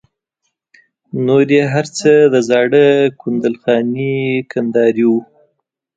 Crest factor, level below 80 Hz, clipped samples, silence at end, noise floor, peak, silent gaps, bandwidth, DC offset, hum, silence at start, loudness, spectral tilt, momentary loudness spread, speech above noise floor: 14 dB; -62 dBFS; under 0.1%; 0.75 s; -72 dBFS; 0 dBFS; none; 9 kHz; under 0.1%; none; 1.15 s; -13 LUFS; -6 dB/octave; 8 LU; 59 dB